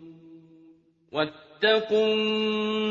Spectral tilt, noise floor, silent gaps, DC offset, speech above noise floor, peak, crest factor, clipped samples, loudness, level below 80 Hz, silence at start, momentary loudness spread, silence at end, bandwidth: -5.5 dB/octave; -57 dBFS; none; under 0.1%; 32 dB; -8 dBFS; 18 dB; under 0.1%; -25 LUFS; -72 dBFS; 0 s; 8 LU; 0 s; 7.4 kHz